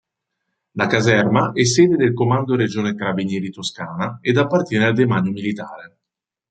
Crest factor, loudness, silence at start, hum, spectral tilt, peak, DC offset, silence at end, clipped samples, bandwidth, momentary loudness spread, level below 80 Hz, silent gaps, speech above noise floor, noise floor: 18 dB; -18 LUFS; 0.75 s; none; -5.5 dB/octave; -2 dBFS; under 0.1%; 0.65 s; under 0.1%; 9.2 kHz; 11 LU; -58 dBFS; none; 66 dB; -84 dBFS